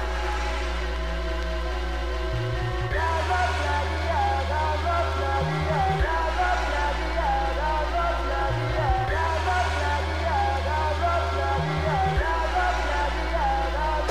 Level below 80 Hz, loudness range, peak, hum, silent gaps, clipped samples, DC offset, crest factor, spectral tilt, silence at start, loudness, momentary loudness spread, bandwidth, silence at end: -30 dBFS; 2 LU; -12 dBFS; none; none; under 0.1%; 0.8%; 14 dB; -5.5 dB/octave; 0 s; -25 LUFS; 5 LU; 13.5 kHz; 0 s